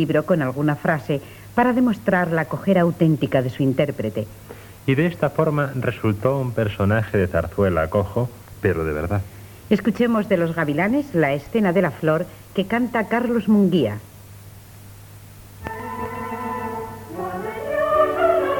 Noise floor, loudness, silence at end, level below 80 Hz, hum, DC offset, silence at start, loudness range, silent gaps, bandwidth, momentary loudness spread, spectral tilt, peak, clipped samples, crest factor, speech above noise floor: -42 dBFS; -21 LUFS; 0 s; -46 dBFS; none; under 0.1%; 0 s; 5 LU; none; 19 kHz; 11 LU; -7.5 dB/octave; -2 dBFS; under 0.1%; 18 dB; 22 dB